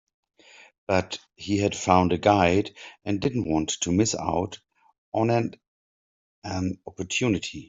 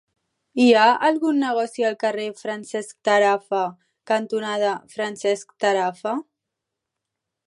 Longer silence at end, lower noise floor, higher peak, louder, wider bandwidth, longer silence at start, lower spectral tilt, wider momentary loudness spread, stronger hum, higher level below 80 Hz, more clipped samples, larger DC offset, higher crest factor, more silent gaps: second, 0.05 s vs 1.25 s; first, under -90 dBFS vs -83 dBFS; about the same, -4 dBFS vs -4 dBFS; second, -25 LUFS vs -22 LUFS; second, 8 kHz vs 11.5 kHz; first, 0.9 s vs 0.55 s; about the same, -5 dB/octave vs -4 dB/octave; about the same, 15 LU vs 13 LU; neither; first, -56 dBFS vs -80 dBFS; neither; neither; about the same, 22 dB vs 18 dB; first, 4.98-5.12 s, 5.68-6.42 s vs none